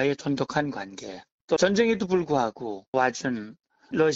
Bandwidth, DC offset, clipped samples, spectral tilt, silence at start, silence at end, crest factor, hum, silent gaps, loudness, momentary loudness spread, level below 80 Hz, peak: 8 kHz; under 0.1%; under 0.1%; -5 dB/octave; 0 s; 0 s; 18 dB; none; 1.32-1.48 s, 2.87-2.93 s; -26 LUFS; 16 LU; -60 dBFS; -8 dBFS